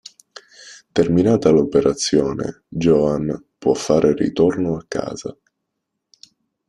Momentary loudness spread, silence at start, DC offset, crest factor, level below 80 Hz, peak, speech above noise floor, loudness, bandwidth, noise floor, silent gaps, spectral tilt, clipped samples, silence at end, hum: 13 LU; 0.6 s; under 0.1%; 18 dB; -48 dBFS; 0 dBFS; 60 dB; -18 LUFS; 11.5 kHz; -78 dBFS; none; -6 dB/octave; under 0.1%; 1.35 s; none